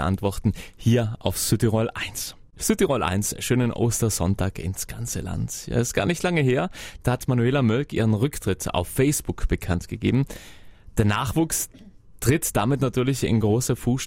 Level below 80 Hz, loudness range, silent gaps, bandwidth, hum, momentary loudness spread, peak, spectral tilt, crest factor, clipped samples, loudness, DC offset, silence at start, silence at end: -40 dBFS; 2 LU; none; 16 kHz; none; 8 LU; -4 dBFS; -5.5 dB/octave; 18 dB; under 0.1%; -24 LUFS; under 0.1%; 0 s; 0 s